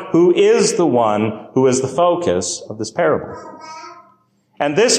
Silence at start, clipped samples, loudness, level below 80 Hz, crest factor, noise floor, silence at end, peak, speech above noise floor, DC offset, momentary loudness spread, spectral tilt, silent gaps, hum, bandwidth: 0 s; under 0.1%; -16 LUFS; -52 dBFS; 14 dB; -57 dBFS; 0 s; -2 dBFS; 41 dB; under 0.1%; 21 LU; -4 dB/octave; none; none; 13.5 kHz